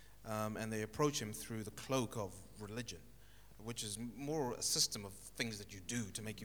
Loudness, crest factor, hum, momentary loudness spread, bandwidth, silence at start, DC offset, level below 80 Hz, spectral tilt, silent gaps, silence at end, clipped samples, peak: -41 LUFS; 22 dB; none; 12 LU; over 20 kHz; 0 s; under 0.1%; -64 dBFS; -3.5 dB/octave; none; 0 s; under 0.1%; -20 dBFS